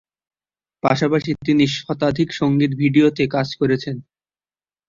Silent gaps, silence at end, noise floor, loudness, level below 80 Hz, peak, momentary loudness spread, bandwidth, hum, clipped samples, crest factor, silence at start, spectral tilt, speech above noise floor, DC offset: none; 0.9 s; under -90 dBFS; -19 LUFS; -52 dBFS; -2 dBFS; 7 LU; 7.6 kHz; none; under 0.1%; 18 dB; 0.85 s; -6.5 dB/octave; over 72 dB; under 0.1%